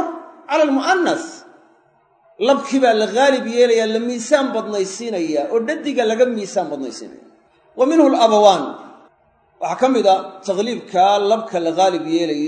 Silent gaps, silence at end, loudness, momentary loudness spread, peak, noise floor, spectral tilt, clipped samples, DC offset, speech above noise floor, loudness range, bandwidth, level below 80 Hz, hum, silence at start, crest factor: none; 0 s; -17 LUFS; 12 LU; 0 dBFS; -57 dBFS; -4 dB/octave; under 0.1%; under 0.1%; 41 dB; 3 LU; 9.4 kHz; -72 dBFS; none; 0 s; 18 dB